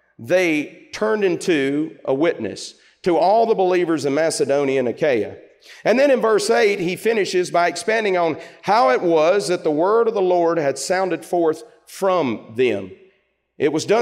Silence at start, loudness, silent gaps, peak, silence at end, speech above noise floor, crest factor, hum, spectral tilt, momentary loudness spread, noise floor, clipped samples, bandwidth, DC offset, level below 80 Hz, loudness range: 0.2 s; -19 LUFS; none; -6 dBFS; 0 s; 44 dB; 14 dB; none; -4.5 dB/octave; 8 LU; -63 dBFS; under 0.1%; 15.5 kHz; under 0.1%; -68 dBFS; 3 LU